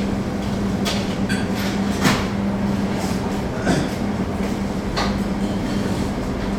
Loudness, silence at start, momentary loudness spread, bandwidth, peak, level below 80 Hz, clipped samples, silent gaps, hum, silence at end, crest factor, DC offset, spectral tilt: -22 LUFS; 0 s; 4 LU; 16.5 kHz; -4 dBFS; -34 dBFS; under 0.1%; none; none; 0 s; 18 dB; under 0.1%; -5.5 dB/octave